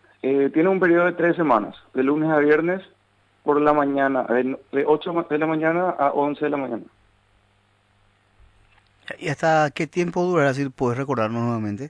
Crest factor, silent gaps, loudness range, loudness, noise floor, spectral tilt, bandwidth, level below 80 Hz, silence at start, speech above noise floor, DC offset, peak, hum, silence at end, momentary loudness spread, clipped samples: 18 dB; none; 7 LU; -21 LUFS; -62 dBFS; -7 dB/octave; 10 kHz; -62 dBFS; 0.25 s; 41 dB; under 0.1%; -4 dBFS; 50 Hz at -55 dBFS; 0 s; 8 LU; under 0.1%